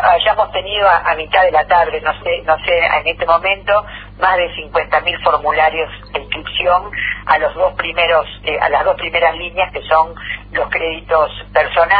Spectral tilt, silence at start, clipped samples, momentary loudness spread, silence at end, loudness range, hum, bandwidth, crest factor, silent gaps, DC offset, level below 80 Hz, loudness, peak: -6.5 dB/octave; 0 s; under 0.1%; 7 LU; 0 s; 2 LU; 50 Hz at -35 dBFS; 5 kHz; 14 dB; none; under 0.1%; -38 dBFS; -15 LUFS; 0 dBFS